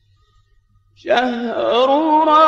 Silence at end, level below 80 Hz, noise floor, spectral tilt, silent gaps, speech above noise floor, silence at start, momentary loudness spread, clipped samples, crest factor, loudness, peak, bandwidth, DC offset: 0 s; -58 dBFS; -56 dBFS; -4.5 dB/octave; none; 42 dB; 1.05 s; 7 LU; under 0.1%; 16 dB; -16 LUFS; -2 dBFS; 7.8 kHz; under 0.1%